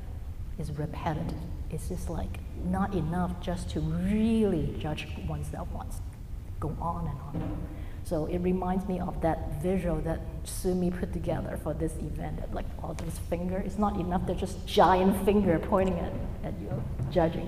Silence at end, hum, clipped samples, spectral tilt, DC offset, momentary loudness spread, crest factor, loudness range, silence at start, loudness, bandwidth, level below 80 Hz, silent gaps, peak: 0 s; none; under 0.1%; -7 dB/octave; under 0.1%; 12 LU; 20 dB; 7 LU; 0 s; -31 LUFS; 15.5 kHz; -38 dBFS; none; -8 dBFS